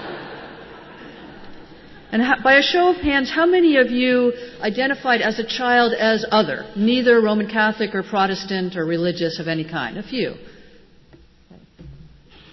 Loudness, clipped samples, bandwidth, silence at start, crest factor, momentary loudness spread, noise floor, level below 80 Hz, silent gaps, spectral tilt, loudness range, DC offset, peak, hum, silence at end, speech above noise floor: -18 LUFS; under 0.1%; 6.2 kHz; 0 s; 16 dB; 20 LU; -49 dBFS; -50 dBFS; none; -5.5 dB/octave; 9 LU; under 0.1%; -4 dBFS; none; 0.45 s; 31 dB